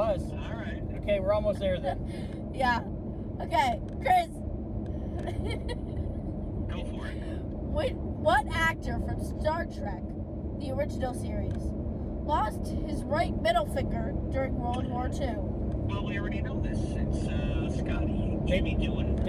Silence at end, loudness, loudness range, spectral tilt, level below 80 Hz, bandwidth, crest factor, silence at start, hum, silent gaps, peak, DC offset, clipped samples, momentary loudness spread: 0 s; -31 LUFS; 3 LU; -7 dB/octave; -36 dBFS; 13.5 kHz; 18 dB; 0 s; none; none; -12 dBFS; under 0.1%; under 0.1%; 9 LU